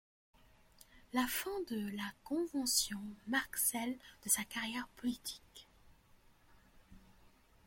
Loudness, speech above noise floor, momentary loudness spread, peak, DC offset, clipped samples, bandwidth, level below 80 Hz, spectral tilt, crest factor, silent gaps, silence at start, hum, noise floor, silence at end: -37 LUFS; 27 dB; 12 LU; -18 dBFS; under 0.1%; under 0.1%; 16.5 kHz; -68 dBFS; -1.5 dB/octave; 24 dB; none; 0.95 s; none; -66 dBFS; 0.55 s